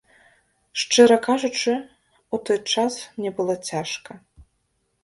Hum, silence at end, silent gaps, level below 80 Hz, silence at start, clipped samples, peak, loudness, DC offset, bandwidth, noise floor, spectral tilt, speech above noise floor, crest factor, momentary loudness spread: none; 0.6 s; none; -62 dBFS; 0.75 s; under 0.1%; 0 dBFS; -22 LUFS; under 0.1%; 11.5 kHz; -71 dBFS; -3 dB/octave; 50 dB; 22 dB; 15 LU